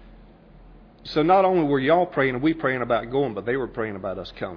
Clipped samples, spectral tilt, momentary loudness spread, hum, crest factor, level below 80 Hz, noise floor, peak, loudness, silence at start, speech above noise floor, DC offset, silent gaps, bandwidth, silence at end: under 0.1%; -8.5 dB/octave; 13 LU; none; 16 dB; -50 dBFS; -48 dBFS; -6 dBFS; -23 LUFS; 0 s; 26 dB; under 0.1%; none; 5.4 kHz; 0 s